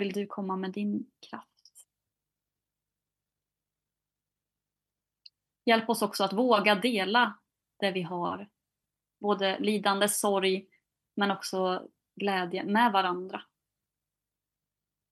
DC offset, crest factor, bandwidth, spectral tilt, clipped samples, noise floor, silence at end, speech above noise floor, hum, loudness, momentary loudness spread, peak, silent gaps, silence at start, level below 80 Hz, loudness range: under 0.1%; 22 dB; 13 kHz; -4 dB/octave; under 0.1%; -90 dBFS; 1.7 s; 61 dB; 50 Hz at -60 dBFS; -28 LUFS; 12 LU; -8 dBFS; none; 0 s; -84 dBFS; 9 LU